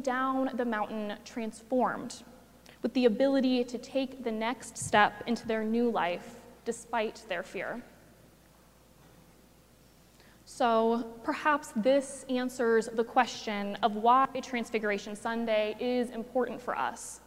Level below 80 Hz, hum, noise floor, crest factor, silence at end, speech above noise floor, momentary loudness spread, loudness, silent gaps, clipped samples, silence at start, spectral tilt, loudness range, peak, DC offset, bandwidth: -66 dBFS; none; -60 dBFS; 22 dB; 0.1 s; 30 dB; 12 LU; -30 LUFS; none; under 0.1%; 0 s; -4 dB/octave; 10 LU; -8 dBFS; under 0.1%; 16 kHz